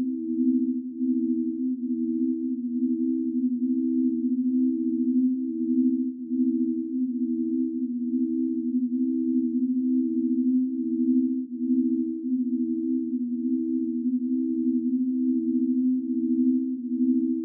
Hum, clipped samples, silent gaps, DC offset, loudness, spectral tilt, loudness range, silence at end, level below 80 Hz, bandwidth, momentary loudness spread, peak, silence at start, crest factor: none; under 0.1%; none; under 0.1%; -26 LUFS; -15.5 dB/octave; 2 LU; 0 s; -90 dBFS; 0.5 kHz; 4 LU; -14 dBFS; 0 s; 12 dB